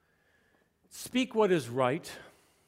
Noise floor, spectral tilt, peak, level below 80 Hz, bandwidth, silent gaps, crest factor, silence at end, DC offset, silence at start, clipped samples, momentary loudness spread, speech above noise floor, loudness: -70 dBFS; -5 dB/octave; -12 dBFS; -72 dBFS; 16 kHz; none; 20 dB; 0.45 s; under 0.1%; 0.95 s; under 0.1%; 20 LU; 40 dB; -30 LUFS